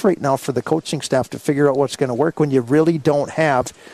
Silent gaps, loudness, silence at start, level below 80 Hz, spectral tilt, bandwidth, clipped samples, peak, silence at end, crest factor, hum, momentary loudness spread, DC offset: none; -18 LUFS; 0 s; -56 dBFS; -6 dB/octave; 14 kHz; under 0.1%; -4 dBFS; 0 s; 14 dB; none; 5 LU; under 0.1%